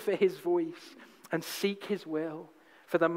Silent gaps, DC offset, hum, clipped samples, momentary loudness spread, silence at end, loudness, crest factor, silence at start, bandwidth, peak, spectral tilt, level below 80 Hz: none; under 0.1%; none; under 0.1%; 18 LU; 0 s; -33 LUFS; 20 dB; 0 s; 16 kHz; -14 dBFS; -5 dB/octave; -84 dBFS